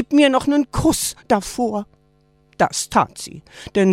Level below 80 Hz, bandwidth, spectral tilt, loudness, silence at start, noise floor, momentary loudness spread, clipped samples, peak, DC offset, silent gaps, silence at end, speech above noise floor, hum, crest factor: -42 dBFS; 16.5 kHz; -4.5 dB/octave; -19 LUFS; 0 s; -57 dBFS; 18 LU; under 0.1%; -2 dBFS; under 0.1%; none; 0 s; 39 dB; none; 18 dB